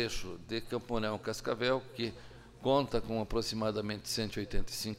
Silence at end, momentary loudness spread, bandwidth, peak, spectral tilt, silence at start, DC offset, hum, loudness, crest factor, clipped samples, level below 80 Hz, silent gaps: 0 s; 9 LU; 16 kHz; -16 dBFS; -4.5 dB/octave; 0 s; under 0.1%; none; -35 LUFS; 18 dB; under 0.1%; -46 dBFS; none